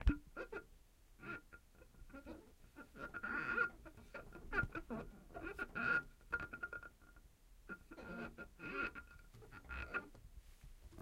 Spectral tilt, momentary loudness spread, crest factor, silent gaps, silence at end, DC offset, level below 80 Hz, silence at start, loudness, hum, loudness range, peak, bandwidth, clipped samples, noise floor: -6.5 dB/octave; 23 LU; 26 dB; none; 0 s; under 0.1%; -54 dBFS; 0 s; -45 LUFS; none; 7 LU; -20 dBFS; 16 kHz; under 0.1%; -65 dBFS